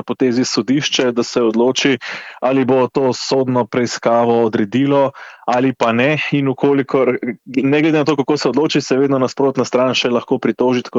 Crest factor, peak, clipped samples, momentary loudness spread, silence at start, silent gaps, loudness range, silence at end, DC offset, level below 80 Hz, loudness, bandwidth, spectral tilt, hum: 12 dB; -2 dBFS; under 0.1%; 4 LU; 0.05 s; none; 1 LU; 0 s; under 0.1%; -62 dBFS; -16 LUFS; 8 kHz; -5 dB/octave; none